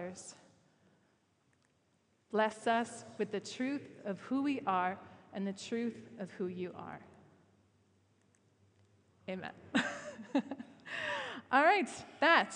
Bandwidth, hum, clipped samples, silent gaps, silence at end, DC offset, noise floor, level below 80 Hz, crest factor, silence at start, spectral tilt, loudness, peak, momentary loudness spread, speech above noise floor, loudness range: 10.5 kHz; none; under 0.1%; none; 0 s; under 0.1%; -75 dBFS; -82 dBFS; 24 dB; 0 s; -4.5 dB/octave; -35 LUFS; -14 dBFS; 19 LU; 40 dB; 11 LU